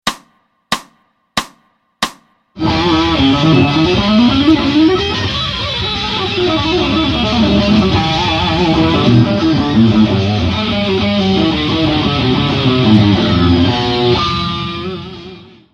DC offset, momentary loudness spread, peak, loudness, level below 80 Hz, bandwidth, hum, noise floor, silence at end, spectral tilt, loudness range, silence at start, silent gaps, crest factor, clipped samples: under 0.1%; 11 LU; 0 dBFS; -13 LUFS; -30 dBFS; 13 kHz; none; -55 dBFS; 0.3 s; -6 dB/octave; 2 LU; 0.05 s; none; 12 dB; under 0.1%